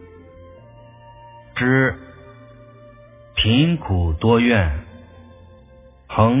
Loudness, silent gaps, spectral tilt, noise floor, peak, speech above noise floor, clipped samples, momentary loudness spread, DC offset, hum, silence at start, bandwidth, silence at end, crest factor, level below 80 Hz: -19 LUFS; none; -10.5 dB/octave; -47 dBFS; -2 dBFS; 30 dB; under 0.1%; 12 LU; under 0.1%; none; 0 s; 3.8 kHz; 0 s; 20 dB; -34 dBFS